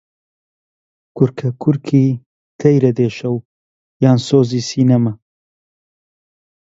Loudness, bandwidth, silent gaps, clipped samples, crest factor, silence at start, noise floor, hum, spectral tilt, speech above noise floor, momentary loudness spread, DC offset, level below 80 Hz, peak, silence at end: -16 LUFS; 7.8 kHz; 2.26-2.59 s, 3.45-4.00 s; under 0.1%; 16 dB; 1.15 s; under -90 dBFS; none; -7.5 dB/octave; over 76 dB; 9 LU; under 0.1%; -56 dBFS; 0 dBFS; 1.5 s